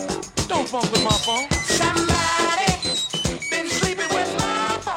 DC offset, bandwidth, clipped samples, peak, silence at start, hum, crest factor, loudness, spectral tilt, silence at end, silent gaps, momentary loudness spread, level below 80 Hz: under 0.1%; 16.5 kHz; under 0.1%; -4 dBFS; 0 s; none; 18 dB; -21 LUFS; -3 dB/octave; 0 s; none; 5 LU; -38 dBFS